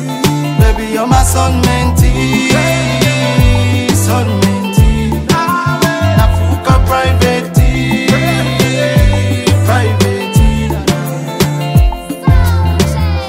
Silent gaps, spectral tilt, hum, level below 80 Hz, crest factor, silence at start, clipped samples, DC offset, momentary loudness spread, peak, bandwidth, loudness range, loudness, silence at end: none; -5.5 dB/octave; none; -16 dBFS; 10 dB; 0 s; under 0.1%; under 0.1%; 4 LU; 0 dBFS; 16.5 kHz; 1 LU; -11 LUFS; 0 s